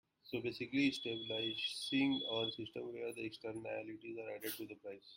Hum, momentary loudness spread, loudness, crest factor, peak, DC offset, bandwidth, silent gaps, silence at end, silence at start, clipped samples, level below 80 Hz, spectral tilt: none; 11 LU; -41 LUFS; 18 dB; -22 dBFS; under 0.1%; 16.5 kHz; none; 0 s; 0.25 s; under 0.1%; -78 dBFS; -4 dB/octave